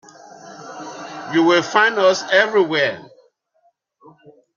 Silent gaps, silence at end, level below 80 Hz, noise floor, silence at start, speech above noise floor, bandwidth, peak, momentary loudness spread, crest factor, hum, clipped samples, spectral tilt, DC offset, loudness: none; 1.5 s; -70 dBFS; -63 dBFS; 0.45 s; 47 dB; 7.4 kHz; -2 dBFS; 21 LU; 18 dB; none; under 0.1%; -3.5 dB/octave; under 0.1%; -16 LUFS